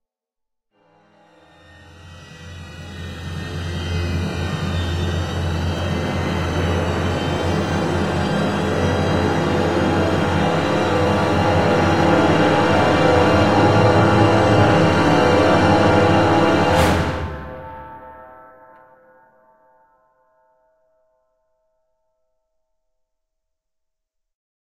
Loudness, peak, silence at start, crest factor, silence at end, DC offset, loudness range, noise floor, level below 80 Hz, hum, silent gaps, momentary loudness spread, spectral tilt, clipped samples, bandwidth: -17 LUFS; -2 dBFS; 1.7 s; 18 dB; 6 s; under 0.1%; 14 LU; -81 dBFS; -38 dBFS; none; none; 16 LU; -6.5 dB/octave; under 0.1%; 15 kHz